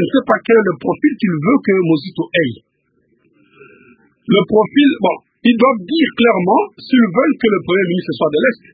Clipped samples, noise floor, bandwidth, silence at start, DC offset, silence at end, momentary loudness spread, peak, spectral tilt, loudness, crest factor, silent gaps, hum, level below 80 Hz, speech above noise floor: under 0.1%; -61 dBFS; 4.9 kHz; 0 s; under 0.1%; 0.2 s; 6 LU; 0 dBFS; -10 dB/octave; -14 LUFS; 14 dB; none; none; -56 dBFS; 47 dB